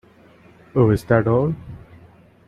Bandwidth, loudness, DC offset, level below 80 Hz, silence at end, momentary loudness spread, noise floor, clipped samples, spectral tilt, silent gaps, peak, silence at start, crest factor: 13 kHz; -19 LUFS; under 0.1%; -46 dBFS; 0.7 s; 14 LU; -50 dBFS; under 0.1%; -9 dB/octave; none; -2 dBFS; 0.75 s; 18 dB